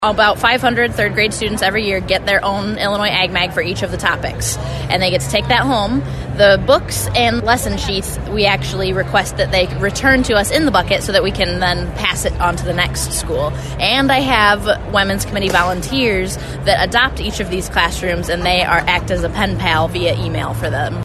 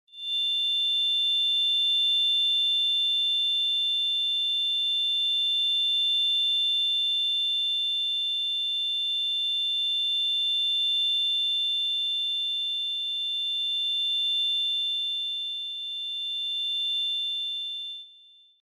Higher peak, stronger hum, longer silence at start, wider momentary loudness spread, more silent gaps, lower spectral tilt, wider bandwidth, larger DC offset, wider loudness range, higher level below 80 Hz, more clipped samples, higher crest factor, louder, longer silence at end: first, 0 dBFS vs -18 dBFS; neither; second, 0 s vs 0.15 s; about the same, 7 LU vs 7 LU; neither; first, -4 dB/octave vs 4.5 dB/octave; second, 13.5 kHz vs 18 kHz; neither; about the same, 2 LU vs 4 LU; first, -28 dBFS vs under -90 dBFS; neither; first, 16 dB vs 8 dB; first, -15 LUFS vs -23 LUFS; second, 0 s vs 0.5 s